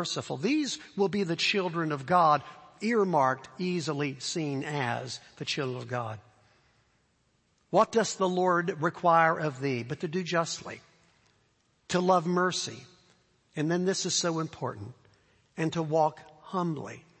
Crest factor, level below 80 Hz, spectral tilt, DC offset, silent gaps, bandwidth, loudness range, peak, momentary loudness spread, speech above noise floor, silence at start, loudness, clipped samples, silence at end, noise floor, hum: 20 dB; -72 dBFS; -4.5 dB/octave; under 0.1%; none; 8.8 kHz; 6 LU; -10 dBFS; 13 LU; 42 dB; 0 s; -29 LUFS; under 0.1%; 0.2 s; -71 dBFS; none